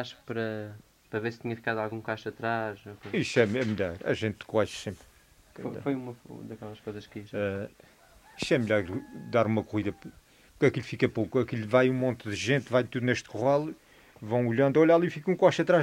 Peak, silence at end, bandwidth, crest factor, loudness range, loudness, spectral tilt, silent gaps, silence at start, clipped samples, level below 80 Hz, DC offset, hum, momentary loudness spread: -8 dBFS; 0 s; 16 kHz; 22 dB; 8 LU; -29 LUFS; -6.5 dB/octave; none; 0 s; under 0.1%; -62 dBFS; under 0.1%; none; 17 LU